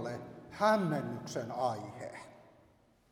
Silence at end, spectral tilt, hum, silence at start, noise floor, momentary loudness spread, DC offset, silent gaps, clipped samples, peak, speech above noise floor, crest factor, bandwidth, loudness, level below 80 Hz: 0.7 s; -6 dB/octave; none; 0 s; -66 dBFS; 19 LU; under 0.1%; none; under 0.1%; -14 dBFS; 33 dB; 22 dB; 16.5 kHz; -34 LUFS; -72 dBFS